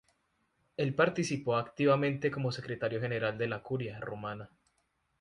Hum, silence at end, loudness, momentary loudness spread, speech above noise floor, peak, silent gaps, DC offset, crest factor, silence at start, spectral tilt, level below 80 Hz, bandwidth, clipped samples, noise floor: none; 0.75 s; -33 LUFS; 11 LU; 45 dB; -12 dBFS; none; under 0.1%; 22 dB; 0.8 s; -6 dB/octave; -68 dBFS; 11 kHz; under 0.1%; -77 dBFS